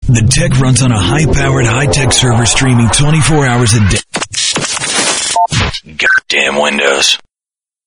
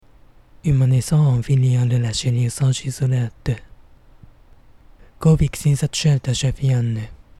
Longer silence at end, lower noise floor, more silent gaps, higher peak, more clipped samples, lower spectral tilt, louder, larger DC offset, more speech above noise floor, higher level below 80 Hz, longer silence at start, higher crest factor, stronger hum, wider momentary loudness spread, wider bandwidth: first, 0.7 s vs 0.25 s; first, under -90 dBFS vs -48 dBFS; neither; first, 0 dBFS vs -6 dBFS; neither; second, -3.5 dB/octave vs -6 dB/octave; first, -10 LUFS vs -19 LUFS; neither; first, over 81 dB vs 31 dB; first, -24 dBFS vs -38 dBFS; second, 0 s vs 0.65 s; about the same, 10 dB vs 14 dB; neither; second, 4 LU vs 8 LU; second, 11 kHz vs 12.5 kHz